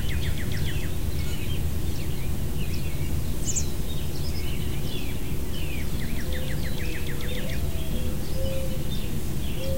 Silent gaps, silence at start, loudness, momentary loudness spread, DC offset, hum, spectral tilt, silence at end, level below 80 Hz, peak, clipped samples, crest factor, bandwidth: none; 0 s; -31 LUFS; 2 LU; 5%; none; -5 dB/octave; 0 s; -32 dBFS; -12 dBFS; under 0.1%; 14 dB; 16 kHz